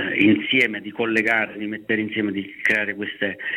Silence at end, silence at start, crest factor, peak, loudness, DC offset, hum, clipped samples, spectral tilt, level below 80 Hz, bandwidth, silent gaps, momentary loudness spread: 0 s; 0 s; 18 dB; -4 dBFS; -21 LUFS; under 0.1%; none; under 0.1%; -5.5 dB/octave; -64 dBFS; 13.5 kHz; none; 9 LU